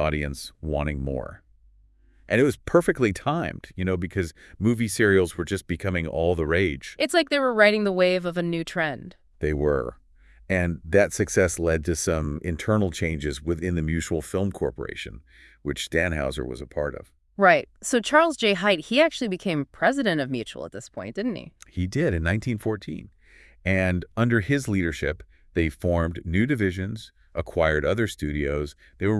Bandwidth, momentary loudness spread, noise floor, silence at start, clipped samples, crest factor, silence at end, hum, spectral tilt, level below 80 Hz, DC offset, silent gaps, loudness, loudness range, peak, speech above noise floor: 12 kHz; 13 LU; -57 dBFS; 0 s; under 0.1%; 22 dB; 0 s; none; -5.5 dB/octave; -42 dBFS; under 0.1%; none; -24 LUFS; 5 LU; -2 dBFS; 33 dB